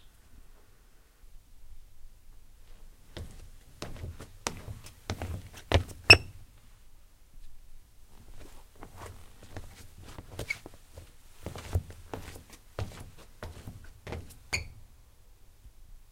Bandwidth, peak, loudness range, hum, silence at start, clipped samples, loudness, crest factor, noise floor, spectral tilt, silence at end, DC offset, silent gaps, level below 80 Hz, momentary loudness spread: 16 kHz; 0 dBFS; 23 LU; none; 0.05 s; under 0.1%; -27 LUFS; 34 dB; -57 dBFS; -3.5 dB/octave; 0.1 s; under 0.1%; none; -46 dBFS; 21 LU